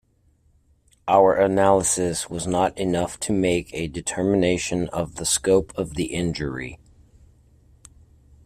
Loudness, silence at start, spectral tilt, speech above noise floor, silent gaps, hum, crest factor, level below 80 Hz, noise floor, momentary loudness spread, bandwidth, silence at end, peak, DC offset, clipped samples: -22 LUFS; 1.05 s; -4.5 dB/octave; 40 dB; none; none; 20 dB; -46 dBFS; -61 dBFS; 11 LU; 15.5 kHz; 1.7 s; -4 dBFS; under 0.1%; under 0.1%